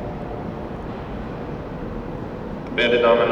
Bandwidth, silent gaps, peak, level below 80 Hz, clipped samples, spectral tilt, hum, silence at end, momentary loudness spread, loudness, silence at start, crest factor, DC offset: 7.4 kHz; none; -4 dBFS; -40 dBFS; under 0.1%; -7 dB/octave; none; 0 s; 15 LU; -24 LUFS; 0 s; 20 dB; under 0.1%